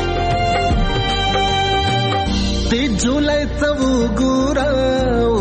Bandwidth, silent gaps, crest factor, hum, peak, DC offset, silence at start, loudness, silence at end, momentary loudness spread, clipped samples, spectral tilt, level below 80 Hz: 8.8 kHz; none; 10 dB; none; -6 dBFS; under 0.1%; 0 s; -17 LUFS; 0 s; 2 LU; under 0.1%; -5 dB/octave; -24 dBFS